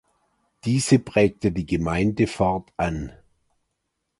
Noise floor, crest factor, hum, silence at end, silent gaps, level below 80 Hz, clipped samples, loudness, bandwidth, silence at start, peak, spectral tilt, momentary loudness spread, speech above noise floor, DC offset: -78 dBFS; 20 dB; none; 1.1 s; none; -42 dBFS; under 0.1%; -23 LUFS; 11.5 kHz; 0.65 s; -4 dBFS; -6 dB/octave; 9 LU; 56 dB; under 0.1%